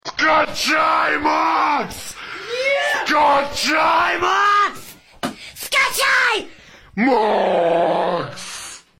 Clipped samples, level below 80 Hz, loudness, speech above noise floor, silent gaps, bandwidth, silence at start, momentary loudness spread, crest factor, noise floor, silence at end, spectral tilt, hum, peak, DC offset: under 0.1%; -52 dBFS; -17 LUFS; 26 dB; none; 16.5 kHz; 0.05 s; 15 LU; 12 dB; -43 dBFS; 0.2 s; -2.5 dB/octave; none; -6 dBFS; under 0.1%